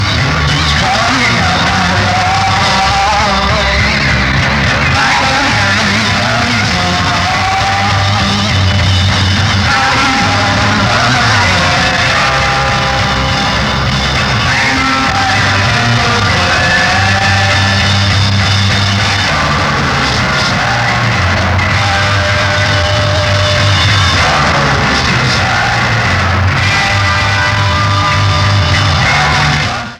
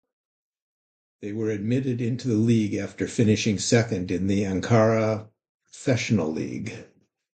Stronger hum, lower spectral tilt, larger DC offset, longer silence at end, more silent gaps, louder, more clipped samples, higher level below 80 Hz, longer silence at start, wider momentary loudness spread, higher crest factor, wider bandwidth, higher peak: neither; second, -4 dB/octave vs -6 dB/octave; neither; second, 0 s vs 0.5 s; second, none vs 5.49-5.60 s; first, -10 LUFS vs -24 LUFS; neither; first, -26 dBFS vs -52 dBFS; second, 0 s vs 1.2 s; second, 2 LU vs 11 LU; second, 10 dB vs 20 dB; first, 12.5 kHz vs 9.2 kHz; first, 0 dBFS vs -6 dBFS